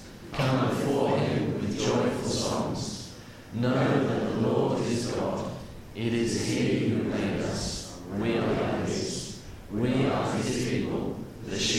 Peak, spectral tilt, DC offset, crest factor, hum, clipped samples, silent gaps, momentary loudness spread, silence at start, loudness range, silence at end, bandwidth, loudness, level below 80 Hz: -12 dBFS; -5.5 dB/octave; under 0.1%; 16 dB; none; under 0.1%; none; 11 LU; 0 s; 2 LU; 0 s; 16 kHz; -28 LUFS; -50 dBFS